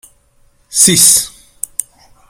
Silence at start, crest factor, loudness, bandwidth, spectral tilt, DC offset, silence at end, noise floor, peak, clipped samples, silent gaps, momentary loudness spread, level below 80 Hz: 0.7 s; 14 dB; -7 LUFS; over 20 kHz; -1.5 dB/octave; under 0.1%; 0.5 s; -52 dBFS; 0 dBFS; 0.5%; none; 19 LU; -48 dBFS